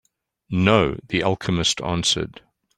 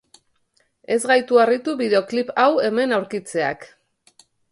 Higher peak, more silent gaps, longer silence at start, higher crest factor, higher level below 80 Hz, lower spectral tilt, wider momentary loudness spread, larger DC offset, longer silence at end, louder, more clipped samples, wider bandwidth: about the same, -2 dBFS vs -2 dBFS; neither; second, 0.5 s vs 0.9 s; about the same, 20 dB vs 18 dB; first, -46 dBFS vs -68 dBFS; about the same, -4 dB/octave vs -4 dB/octave; about the same, 7 LU vs 8 LU; neither; second, 0.5 s vs 0.85 s; about the same, -21 LUFS vs -19 LUFS; neither; about the same, 12.5 kHz vs 11.5 kHz